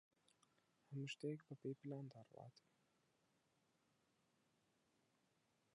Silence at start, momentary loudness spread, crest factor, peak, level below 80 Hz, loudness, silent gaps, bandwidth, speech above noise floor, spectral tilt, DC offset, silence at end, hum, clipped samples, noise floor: 0.9 s; 14 LU; 20 dB; -36 dBFS; under -90 dBFS; -53 LUFS; none; 10.5 kHz; 31 dB; -6.5 dB/octave; under 0.1%; 3.15 s; none; under 0.1%; -84 dBFS